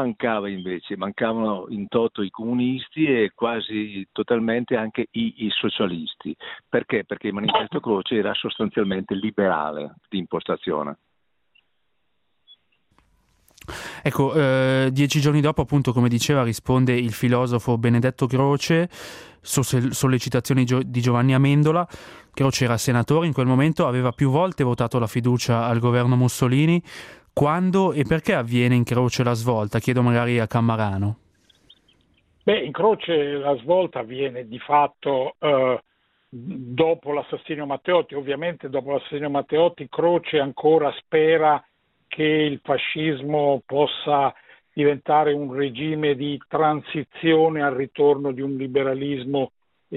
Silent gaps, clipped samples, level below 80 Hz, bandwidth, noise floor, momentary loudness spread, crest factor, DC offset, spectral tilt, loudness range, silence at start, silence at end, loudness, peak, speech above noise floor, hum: none; under 0.1%; -54 dBFS; 15 kHz; -75 dBFS; 10 LU; 16 dB; under 0.1%; -6 dB/octave; 5 LU; 0 s; 0 s; -22 LUFS; -6 dBFS; 54 dB; none